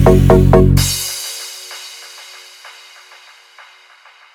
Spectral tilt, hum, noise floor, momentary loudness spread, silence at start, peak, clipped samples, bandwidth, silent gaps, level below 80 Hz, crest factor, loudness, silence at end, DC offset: -5.5 dB/octave; none; -45 dBFS; 26 LU; 0 s; 0 dBFS; under 0.1%; over 20 kHz; none; -24 dBFS; 14 dB; -12 LUFS; 2.15 s; under 0.1%